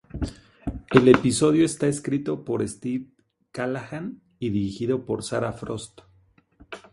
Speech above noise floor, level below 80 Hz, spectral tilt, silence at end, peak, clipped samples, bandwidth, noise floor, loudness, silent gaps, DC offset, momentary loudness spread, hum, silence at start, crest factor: 37 dB; -46 dBFS; -6 dB/octave; 0.15 s; 0 dBFS; under 0.1%; 11.5 kHz; -60 dBFS; -24 LUFS; none; under 0.1%; 18 LU; none; 0.15 s; 24 dB